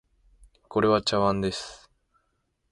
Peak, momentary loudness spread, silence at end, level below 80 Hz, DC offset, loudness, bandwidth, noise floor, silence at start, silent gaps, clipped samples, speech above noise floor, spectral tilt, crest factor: -8 dBFS; 12 LU; 0.95 s; -54 dBFS; under 0.1%; -25 LUFS; 11.5 kHz; -74 dBFS; 0.7 s; none; under 0.1%; 50 dB; -5 dB/octave; 20 dB